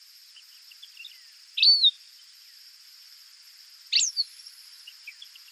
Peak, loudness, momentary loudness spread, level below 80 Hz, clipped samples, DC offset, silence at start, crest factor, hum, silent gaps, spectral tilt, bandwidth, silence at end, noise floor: -10 dBFS; -21 LUFS; 28 LU; under -90 dBFS; under 0.1%; under 0.1%; 1 s; 20 dB; none; none; 11.5 dB/octave; 14 kHz; 0.4 s; -52 dBFS